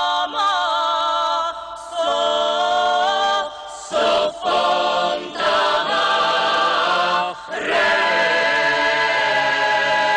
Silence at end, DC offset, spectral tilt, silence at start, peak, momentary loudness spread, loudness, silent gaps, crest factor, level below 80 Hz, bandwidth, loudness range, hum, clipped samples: 0 s; under 0.1%; -1.5 dB/octave; 0 s; -10 dBFS; 6 LU; -18 LUFS; none; 8 dB; -58 dBFS; 11 kHz; 2 LU; none; under 0.1%